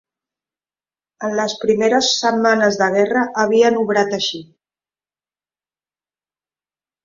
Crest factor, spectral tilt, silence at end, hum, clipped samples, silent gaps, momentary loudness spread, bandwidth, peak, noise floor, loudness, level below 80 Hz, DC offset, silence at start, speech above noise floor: 18 dB; -3.5 dB/octave; 2.6 s; none; under 0.1%; none; 8 LU; 7.6 kHz; -2 dBFS; under -90 dBFS; -16 LUFS; -62 dBFS; under 0.1%; 1.2 s; over 74 dB